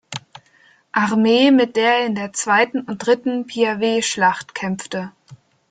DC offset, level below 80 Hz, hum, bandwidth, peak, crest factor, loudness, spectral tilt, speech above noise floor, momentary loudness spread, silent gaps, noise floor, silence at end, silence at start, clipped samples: under 0.1%; -64 dBFS; none; 9.6 kHz; -2 dBFS; 16 dB; -18 LUFS; -4 dB/octave; 37 dB; 13 LU; none; -55 dBFS; 0.35 s; 0.1 s; under 0.1%